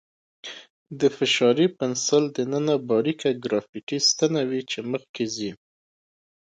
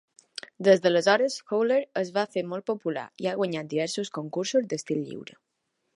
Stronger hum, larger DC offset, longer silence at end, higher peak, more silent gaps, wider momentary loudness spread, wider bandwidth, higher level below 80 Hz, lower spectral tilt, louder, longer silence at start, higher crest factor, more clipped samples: neither; neither; first, 0.95 s vs 0.75 s; about the same, -6 dBFS vs -6 dBFS; first, 0.70-0.86 s, 3.69-3.73 s, 3.83-3.87 s, 5.09-5.14 s vs none; about the same, 18 LU vs 16 LU; second, 9.4 kHz vs 11.5 kHz; first, -70 dBFS vs -80 dBFS; about the same, -3.5 dB/octave vs -4.5 dB/octave; first, -23 LUFS vs -26 LUFS; second, 0.45 s vs 0.6 s; about the same, 18 dB vs 20 dB; neither